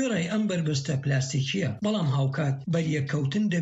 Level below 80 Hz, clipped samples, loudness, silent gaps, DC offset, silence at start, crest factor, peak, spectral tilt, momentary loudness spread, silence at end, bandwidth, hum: -62 dBFS; under 0.1%; -27 LUFS; none; under 0.1%; 0 s; 10 dB; -16 dBFS; -6 dB/octave; 2 LU; 0 s; 8 kHz; none